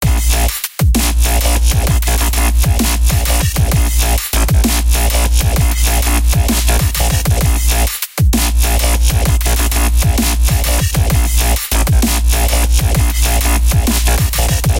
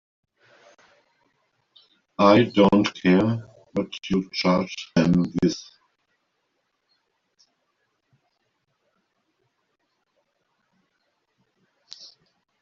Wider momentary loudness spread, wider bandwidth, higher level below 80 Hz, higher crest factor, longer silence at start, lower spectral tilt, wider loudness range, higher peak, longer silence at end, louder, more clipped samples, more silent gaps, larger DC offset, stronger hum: second, 1 LU vs 19 LU; first, 17.5 kHz vs 7.2 kHz; first, -14 dBFS vs -56 dBFS; second, 10 dB vs 24 dB; second, 0 s vs 2.2 s; second, -4 dB/octave vs -5.5 dB/octave; second, 0 LU vs 7 LU; about the same, -2 dBFS vs -2 dBFS; second, 0 s vs 7 s; first, -13 LUFS vs -21 LUFS; neither; neither; first, 0.4% vs under 0.1%; neither